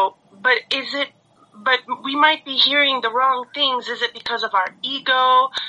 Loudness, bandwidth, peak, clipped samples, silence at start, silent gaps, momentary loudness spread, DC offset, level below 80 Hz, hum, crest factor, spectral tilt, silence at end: -18 LUFS; 9.6 kHz; 0 dBFS; under 0.1%; 0 s; none; 9 LU; under 0.1%; -70 dBFS; none; 20 dB; -2 dB/octave; 0 s